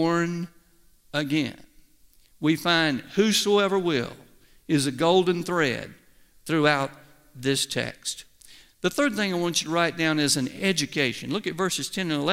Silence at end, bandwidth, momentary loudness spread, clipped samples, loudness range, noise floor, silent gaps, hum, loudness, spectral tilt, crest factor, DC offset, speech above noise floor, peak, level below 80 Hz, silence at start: 0 s; 16 kHz; 12 LU; under 0.1%; 4 LU; -58 dBFS; none; none; -25 LUFS; -4 dB/octave; 20 dB; under 0.1%; 34 dB; -6 dBFS; -60 dBFS; 0 s